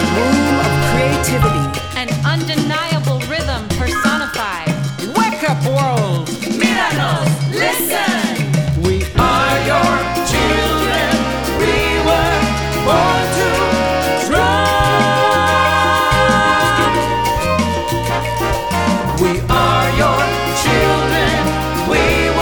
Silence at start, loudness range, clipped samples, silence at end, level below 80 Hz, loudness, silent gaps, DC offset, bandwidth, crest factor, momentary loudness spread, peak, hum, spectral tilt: 0 s; 4 LU; under 0.1%; 0 s; -28 dBFS; -15 LUFS; none; under 0.1%; over 20 kHz; 14 dB; 6 LU; -2 dBFS; none; -4.5 dB/octave